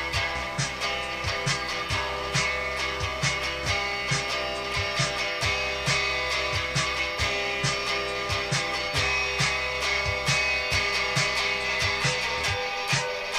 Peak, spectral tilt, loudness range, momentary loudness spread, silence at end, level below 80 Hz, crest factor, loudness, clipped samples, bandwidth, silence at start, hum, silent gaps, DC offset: -10 dBFS; -2.5 dB/octave; 3 LU; 4 LU; 0 s; -44 dBFS; 16 dB; -25 LUFS; under 0.1%; 15.5 kHz; 0 s; none; none; under 0.1%